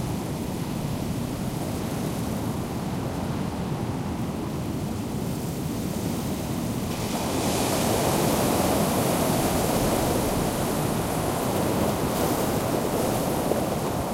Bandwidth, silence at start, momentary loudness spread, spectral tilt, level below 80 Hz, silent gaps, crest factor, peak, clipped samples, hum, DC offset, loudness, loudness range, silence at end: 16 kHz; 0 s; 7 LU; -5 dB/octave; -42 dBFS; none; 16 dB; -8 dBFS; under 0.1%; none; under 0.1%; -26 LUFS; 6 LU; 0 s